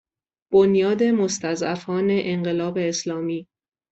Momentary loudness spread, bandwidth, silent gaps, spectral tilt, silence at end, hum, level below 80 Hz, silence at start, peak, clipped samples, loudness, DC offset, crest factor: 9 LU; 8.2 kHz; none; -5.5 dB/octave; 0.5 s; none; -62 dBFS; 0.5 s; -6 dBFS; under 0.1%; -22 LUFS; under 0.1%; 16 dB